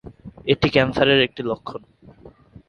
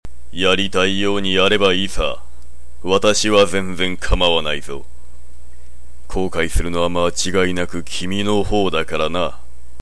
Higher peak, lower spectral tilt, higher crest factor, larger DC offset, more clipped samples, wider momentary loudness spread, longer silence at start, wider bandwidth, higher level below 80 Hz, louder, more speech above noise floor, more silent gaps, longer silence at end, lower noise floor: first, 0 dBFS vs -4 dBFS; first, -6.5 dB/octave vs -3.5 dB/octave; first, 22 dB vs 16 dB; second, under 0.1% vs 10%; neither; first, 16 LU vs 11 LU; about the same, 0.05 s vs 0 s; second, 7 kHz vs 11 kHz; second, -46 dBFS vs -30 dBFS; about the same, -19 LUFS vs -18 LUFS; about the same, 27 dB vs 25 dB; neither; about the same, 0.4 s vs 0.45 s; first, -47 dBFS vs -43 dBFS